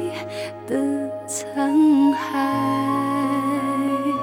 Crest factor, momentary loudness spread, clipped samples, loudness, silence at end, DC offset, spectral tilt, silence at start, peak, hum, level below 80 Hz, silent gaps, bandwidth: 12 dB; 12 LU; under 0.1%; -21 LUFS; 0 s; under 0.1%; -5 dB/octave; 0 s; -8 dBFS; none; -68 dBFS; none; 16 kHz